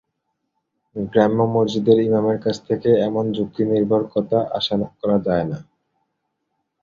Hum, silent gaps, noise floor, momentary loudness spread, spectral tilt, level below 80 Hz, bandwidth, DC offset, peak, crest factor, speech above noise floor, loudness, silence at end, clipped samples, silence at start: none; none; -75 dBFS; 7 LU; -7.5 dB/octave; -54 dBFS; 7.6 kHz; under 0.1%; -2 dBFS; 18 dB; 56 dB; -19 LUFS; 1.2 s; under 0.1%; 0.95 s